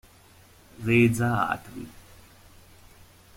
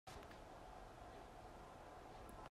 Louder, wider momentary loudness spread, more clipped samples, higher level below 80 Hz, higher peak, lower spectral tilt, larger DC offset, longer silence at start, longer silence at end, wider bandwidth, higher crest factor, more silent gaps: first, -24 LUFS vs -58 LUFS; first, 21 LU vs 1 LU; neither; first, -54 dBFS vs -64 dBFS; first, -10 dBFS vs -42 dBFS; first, -6.5 dB/octave vs -5 dB/octave; neither; first, 0.8 s vs 0.05 s; first, 1.5 s vs 0 s; about the same, 16.5 kHz vs 15.5 kHz; first, 20 dB vs 14 dB; neither